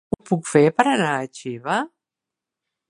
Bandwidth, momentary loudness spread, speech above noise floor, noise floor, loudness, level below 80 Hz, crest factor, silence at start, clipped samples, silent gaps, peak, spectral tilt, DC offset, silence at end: 11.5 kHz; 14 LU; 67 dB; -87 dBFS; -20 LUFS; -58 dBFS; 22 dB; 0.25 s; under 0.1%; none; 0 dBFS; -5.5 dB/octave; under 0.1%; 1.05 s